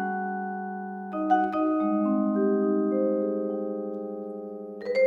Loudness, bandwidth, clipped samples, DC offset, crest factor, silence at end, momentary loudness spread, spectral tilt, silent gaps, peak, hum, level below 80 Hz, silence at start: -27 LUFS; 4.9 kHz; under 0.1%; under 0.1%; 16 dB; 0 s; 11 LU; -9 dB/octave; none; -10 dBFS; none; -74 dBFS; 0 s